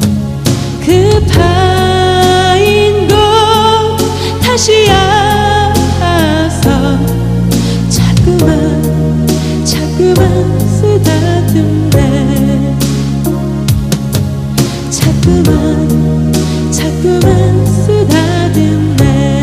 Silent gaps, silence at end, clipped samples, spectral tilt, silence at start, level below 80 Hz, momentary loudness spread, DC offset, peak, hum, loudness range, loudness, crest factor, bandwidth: none; 0 s; 0.3%; -5.5 dB/octave; 0 s; -22 dBFS; 6 LU; under 0.1%; 0 dBFS; none; 3 LU; -10 LUFS; 8 dB; 16 kHz